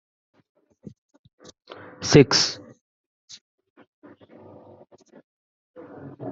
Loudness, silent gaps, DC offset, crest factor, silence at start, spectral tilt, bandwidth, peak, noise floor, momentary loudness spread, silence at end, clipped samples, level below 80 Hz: -18 LUFS; 2.81-3.28 s, 3.41-3.58 s, 3.70-3.76 s, 3.87-4.02 s, 5.24-5.74 s; under 0.1%; 26 dB; 2 s; -4.5 dB/octave; 8 kHz; -2 dBFS; -48 dBFS; 31 LU; 0 s; under 0.1%; -58 dBFS